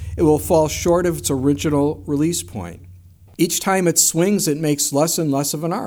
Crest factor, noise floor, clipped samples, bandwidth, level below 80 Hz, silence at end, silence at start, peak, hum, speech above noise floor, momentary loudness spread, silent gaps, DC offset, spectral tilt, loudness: 18 dB; -44 dBFS; under 0.1%; over 20 kHz; -40 dBFS; 0 s; 0 s; -2 dBFS; none; 26 dB; 7 LU; none; under 0.1%; -4.5 dB/octave; -18 LUFS